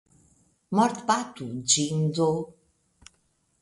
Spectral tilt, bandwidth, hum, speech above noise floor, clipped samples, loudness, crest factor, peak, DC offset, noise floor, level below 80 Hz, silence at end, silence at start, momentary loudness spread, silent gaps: -4 dB/octave; 11.5 kHz; none; 45 dB; under 0.1%; -25 LUFS; 20 dB; -8 dBFS; under 0.1%; -70 dBFS; -66 dBFS; 1.1 s; 0.7 s; 10 LU; none